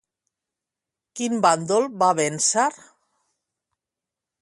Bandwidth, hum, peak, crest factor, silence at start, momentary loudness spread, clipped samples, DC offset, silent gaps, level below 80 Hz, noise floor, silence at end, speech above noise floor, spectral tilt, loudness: 11.5 kHz; none; -4 dBFS; 20 dB; 1.15 s; 8 LU; under 0.1%; under 0.1%; none; -72 dBFS; -87 dBFS; 1.65 s; 66 dB; -3 dB/octave; -21 LUFS